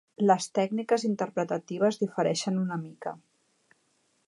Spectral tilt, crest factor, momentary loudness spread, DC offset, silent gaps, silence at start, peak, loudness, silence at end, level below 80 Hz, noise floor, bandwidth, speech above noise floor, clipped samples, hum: -5.5 dB/octave; 20 dB; 13 LU; under 0.1%; none; 0.2 s; -10 dBFS; -28 LUFS; 1.1 s; -80 dBFS; -71 dBFS; 11.5 kHz; 43 dB; under 0.1%; none